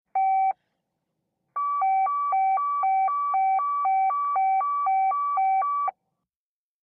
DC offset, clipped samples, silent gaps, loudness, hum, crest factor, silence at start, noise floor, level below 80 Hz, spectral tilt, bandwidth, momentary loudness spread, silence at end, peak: under 0.1%; under 0.1%; none; -24 LUFS; none; 8 dB; 0.15 s; under -90 dBFS; under -90 dBFS; -4.5 dB/octave; 2.6 kHz; 5 LU; 0.9 s; -18 dBFS